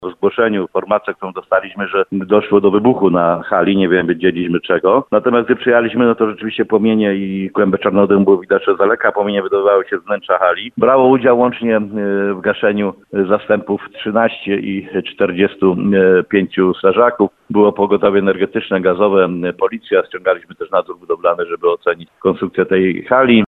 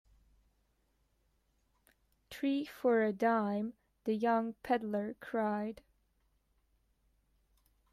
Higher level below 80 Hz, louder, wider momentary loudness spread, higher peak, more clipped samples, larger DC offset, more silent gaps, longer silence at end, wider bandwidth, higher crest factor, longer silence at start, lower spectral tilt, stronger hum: first, -54 dBFS vs -72 dBFS; first, -14 LUFS vs -35 LUFS; second, 7 LU vs 13 LU; first, 0 dBFS vs -18 dBFS; neither; neither; neither; second, 0.05 s vs 2.2 s; second, 4.1 kHz vs 14.5 kHz; about the same, 14 dB vs 18 dB; second, 0 s vs 2.3 s; first, -9 dB/octave vs -7 dB/octave; neither